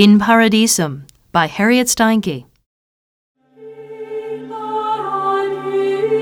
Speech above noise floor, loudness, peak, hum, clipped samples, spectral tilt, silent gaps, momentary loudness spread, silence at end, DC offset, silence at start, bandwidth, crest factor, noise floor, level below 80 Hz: 25 dB; -16 LUFS; 0 dBFS; none; under 0.1%; -4 dB/octave; 2.66-3.35 s; 17 LU; 0 s; under 0.1%; 0 s; 18.5 kHz; 16 dB; -38 dBFS; -54 dBFS